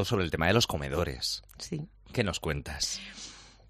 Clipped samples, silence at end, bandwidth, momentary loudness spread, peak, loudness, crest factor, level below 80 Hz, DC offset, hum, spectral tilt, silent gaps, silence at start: under 0.1%; 0.2 s; 15.5 kHz; 14 LU; -10 dBFS; -31 LUFS; 22 dB; -46 dBFS; under 0.1%; none; -4 dB/octave; none; 0 s